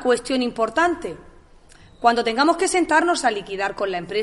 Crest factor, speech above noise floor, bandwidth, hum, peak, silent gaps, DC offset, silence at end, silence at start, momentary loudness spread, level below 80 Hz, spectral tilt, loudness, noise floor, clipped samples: 18 dB; 28 dB; 11.5 kHz; none; -2 dBFS; none; under 0.1%; 0 s; 0 s; 9 LU; -50 dBFS; -3 dB/octave; -20 LUFS; -48 dBFS; under 0.1%